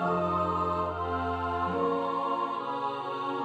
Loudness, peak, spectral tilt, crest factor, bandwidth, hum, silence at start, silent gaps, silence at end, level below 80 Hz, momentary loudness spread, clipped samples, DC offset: -30 LUFS; -16 dBFS; -7.5 dB/octave; 14 dB; 9 kHz; none; 0 s; none; 0 s; -54 dBFS; 5 LU; under 0.1%; under 0.1%